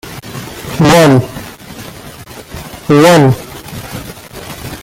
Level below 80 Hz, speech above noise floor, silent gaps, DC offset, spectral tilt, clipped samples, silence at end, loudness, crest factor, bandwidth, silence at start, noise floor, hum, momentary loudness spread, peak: -38 dBFS; 25 dB; none; under 0.1%; -5.5 dB/octave; under 0.1%; 0 s; -9 LUFS; 12 dB; 17 kHz; 0.05 s; -31 dBFS; none; 23 LU; 0 dBFS